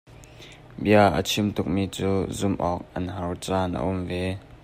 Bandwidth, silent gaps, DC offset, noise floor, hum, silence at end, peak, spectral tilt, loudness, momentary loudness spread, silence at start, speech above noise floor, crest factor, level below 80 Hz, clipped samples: 16 kHz; none; under 0.1%; -46 dBFS; none; 0.1 s; -6 dBFS; -5.5 dB/octave; -25 LUFS; 13 LU; 0.1 s; 22 dB; 20 dB; -48 dBFS; under 0.1%